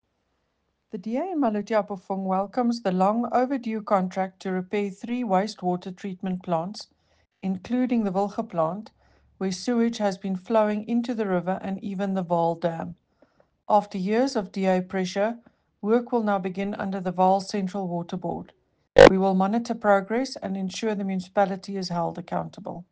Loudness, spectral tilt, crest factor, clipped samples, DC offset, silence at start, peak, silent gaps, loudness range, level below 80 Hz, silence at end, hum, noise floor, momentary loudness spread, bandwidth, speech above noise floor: -25 LUFS; -6.5 dB/octave; 22 dB; under 0.1%; under 0.1%; 0.95 s; -2 dBFS; none; 7 LU; -52 dBFS; 0.1 s; none; -74 dBFS; 9 LU; 9.2 kHz; 50 dB